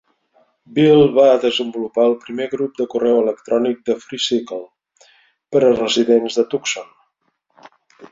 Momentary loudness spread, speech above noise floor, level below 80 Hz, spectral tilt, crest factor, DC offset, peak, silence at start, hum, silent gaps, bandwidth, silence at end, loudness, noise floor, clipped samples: 12 LU; 52 dB; -60 dBFS; -5 dB/octave; 16 dB; under 0.1%; -2 dBFS; 0.7 s; none; none; 7.8 kHz; 0.05 s; -17 LUFS; -68 dBFS; under 0.1%